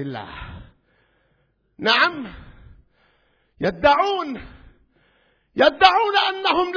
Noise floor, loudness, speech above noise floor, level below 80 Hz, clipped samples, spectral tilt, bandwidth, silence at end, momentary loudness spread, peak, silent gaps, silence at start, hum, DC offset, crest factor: -66 dBFS; -18 LUFS; 47 dB; -48 dBFS; under 0.1%; -4.5 dB/octave; 5.4 kHz; 0 s; 21 LU; 0 dBFS; none; 0 s; none; under 0.1%; 22 dB